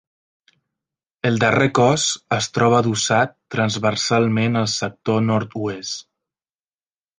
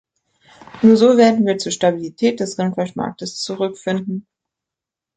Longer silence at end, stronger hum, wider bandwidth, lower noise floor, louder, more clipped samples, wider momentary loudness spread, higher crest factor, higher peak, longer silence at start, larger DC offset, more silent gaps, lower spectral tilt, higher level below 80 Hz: first, 1.2 s vs 0.95 s; neither; about the same, 10 kHz vs 9.2 kHz; first, under -90 dBFS vs -86 dBFS; about the same, -19 LUFS vs -17 LUFS; neither; second, 9 LU vs 14 LU; about the same, 18 dB vs 16 dB; about the same, -2 dBFS vs -2 dBFS; first, 1.25 s vs 0.75 s; neither; neither; about the same, -4.5 dB/octave vs -5.5 dB/octave; about the same, -56 dBFS vs -60 dBFS